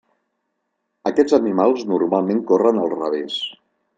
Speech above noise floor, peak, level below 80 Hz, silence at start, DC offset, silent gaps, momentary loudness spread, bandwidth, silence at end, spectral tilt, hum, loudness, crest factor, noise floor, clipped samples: 57 dB; -2 dBFS; -66 dBFS; 1.05 s; under 0.1%; none; 9 LU; 9 kHz; 0.45 s; -6 dB/octave; none; -19 LUFS; 18 dB; -74 dBFS; under 0.1%